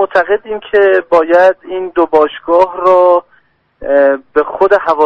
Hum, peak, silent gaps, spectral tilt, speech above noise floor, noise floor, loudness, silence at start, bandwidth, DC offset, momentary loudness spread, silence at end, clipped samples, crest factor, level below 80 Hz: none; 0 dBFS; none; -5.5 dB/octave; 42 dB; -52 dBFS; -11 LUFS; 0 s; 6.4 kHz; under 0.1%; 7 LU; 0 s; 0.2%; 10 dB; -48 dBFS